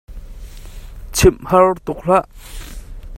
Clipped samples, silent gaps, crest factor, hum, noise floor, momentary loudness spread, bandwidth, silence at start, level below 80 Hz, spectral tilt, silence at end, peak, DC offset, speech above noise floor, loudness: under 0.1%; none; 18 dB; none; -33 dBFS; 24 LU; 16.5 kHz; 0.1 s; -30 dBFS; -5 dB/octave; 0 s; 0 dBFS; under 0.1%; 18 dB; -15 LUFS